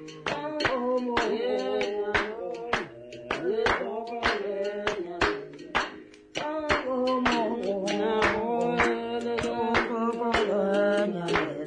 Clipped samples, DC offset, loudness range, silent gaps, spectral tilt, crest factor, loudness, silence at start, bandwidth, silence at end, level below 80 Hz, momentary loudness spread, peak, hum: under 0.1%; under 0.1%; 3 LU; none; -4.5 dB/octave; 16 dB; -28 LUFS; 0 s; 10 kHz; 0 s; -52 dBFS; 8 LU; -12 dBFS; none